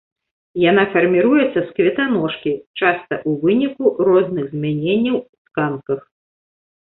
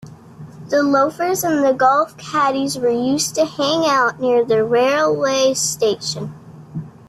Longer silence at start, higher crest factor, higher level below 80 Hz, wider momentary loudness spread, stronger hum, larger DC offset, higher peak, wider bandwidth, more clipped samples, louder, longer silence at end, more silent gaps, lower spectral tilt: first, 0.55 s vs 0.05 s; about the same, 16 dB vs 14 dB; about the same, -60 dBFS vs -60 dBFS; about the same, 10 LU vs 9 LU; neither; neither; about the same, -2 dBFS vs -4 dBFS; second, 4.1 kHz vs 14.5 kHz; neither; about the same, -18 LUFS vs -17 LUFS; first, 0.9 s vs 0.2 s; first, 2.67-2.74 s, 5.29-5.45 s vs none; first, -11 dB/octave vs -3.5 dB/octave